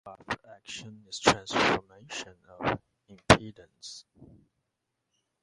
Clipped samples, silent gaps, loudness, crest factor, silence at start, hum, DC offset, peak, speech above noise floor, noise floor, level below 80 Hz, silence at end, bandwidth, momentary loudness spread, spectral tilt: under 0.1%; none; -28 LUFS; 30 dB; 0.05 s; none; under 0.1%; -2 dBFS; 51 dB; -83 dBFS; -52 dBFS; 1.45 s; 11.5 kHz; 23 LU; -4 dB/octave